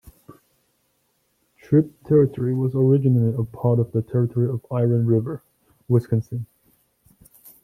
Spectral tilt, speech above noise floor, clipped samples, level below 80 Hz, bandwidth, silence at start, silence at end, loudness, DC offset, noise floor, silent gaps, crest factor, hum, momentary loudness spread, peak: -11.5 dB/octave; 49 dB; under 0.1%; -58 dBFS; 14 kHz; 0.3 s; 1.2 s; -21 LUFS; under 0.1%; -68 dBFS; none; 16 dB; none; 9 LU; -6 dBFS